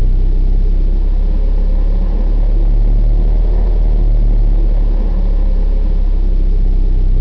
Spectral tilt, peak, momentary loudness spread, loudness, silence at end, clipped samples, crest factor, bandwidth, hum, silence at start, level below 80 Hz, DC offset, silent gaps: -10.5 dB/octave; -6 dBFS; 2 LU; -17 LUFS; 0 s; under 0.1%; 4 dB; 1.9 kHz; none; 0 s; -10 dBFS; under 0.1%; none